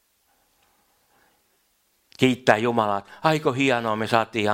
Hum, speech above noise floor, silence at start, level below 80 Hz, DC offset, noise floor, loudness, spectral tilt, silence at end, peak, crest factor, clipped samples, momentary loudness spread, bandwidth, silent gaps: none; 46 dB; 2.2 s; -64 dBFS; under 0.1%; -67 dBFS; -22 LUFS; -5.5 dB/octave; 0 s; 0 dBFS; 24 dB; under 0.1%; 4 LU; 16 kHz; none